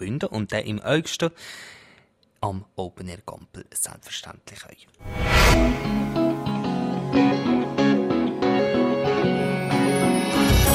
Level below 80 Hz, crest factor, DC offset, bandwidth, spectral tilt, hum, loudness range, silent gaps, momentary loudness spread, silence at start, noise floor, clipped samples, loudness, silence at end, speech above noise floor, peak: -32 dBFS; 16 dB; under 0.1%; 16 kHz; -5 dB/octave; none; 12 LU; none; 20 LU; 0 s; -59 dBFS; under 0.1%; -22 LUFS; 0 s; 34 dB; -6 dBFS